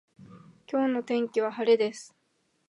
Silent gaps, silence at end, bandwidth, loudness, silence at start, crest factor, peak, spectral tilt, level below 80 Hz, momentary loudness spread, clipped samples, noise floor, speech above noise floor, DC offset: none; 0.65 s; 11 kHz; -27 LUFS; 0.35 s; 18 dB; -10 dBFS; -4.5 dB/octave; -80 dBFS; 8 LU; under 0.1%; -51 dBFS; 25 dB; under 0.1%